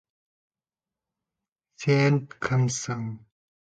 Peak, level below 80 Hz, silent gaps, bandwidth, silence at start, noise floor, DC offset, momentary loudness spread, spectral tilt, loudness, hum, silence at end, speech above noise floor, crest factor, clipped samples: -10 dBFS; -62 dBFS; none; 9.2 kHz; 1.8 s; under -90 dBFS; under 0.1%; 13 LU; -5.5 dB/octave; -25 LUFS; none; 0.5 s; over 66 dB; 18 dB; under 0.1%